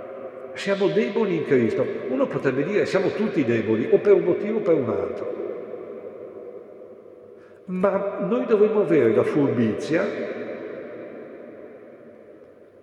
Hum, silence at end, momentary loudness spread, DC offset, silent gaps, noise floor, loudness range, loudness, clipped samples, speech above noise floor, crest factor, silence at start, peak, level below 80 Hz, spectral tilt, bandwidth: none; 0.4 s; 21 LU; under 0.1%; none; -48 dBFS; 8 LU; -22 LUFS; under 0.1%; 27 dB; 18 dB; 0 s; -6 dBFS; -72 dBFS; -7.5 dB/octave; 9.4 kHz